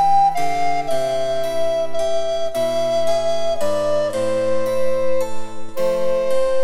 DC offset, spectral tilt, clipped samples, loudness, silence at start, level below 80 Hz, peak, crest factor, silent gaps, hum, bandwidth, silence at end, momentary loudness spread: under 0.1%; -4 dB/octave; under 0.1%; -20 LUFS; 0 s; -46 dBFS; -6 dBFS; 10 dB; none; none; 16 kHz; 0 s; 3 LU